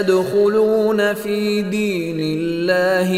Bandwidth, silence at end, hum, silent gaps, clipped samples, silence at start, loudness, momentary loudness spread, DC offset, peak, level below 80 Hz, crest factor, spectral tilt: 16 kHz; 0 s; none; none; under 0.1%; 0 s; -18 LUFS; 6 LU; under 0.1%; -4 dBFS; -54 dBFS; 14 dB; -5.5 dB/octave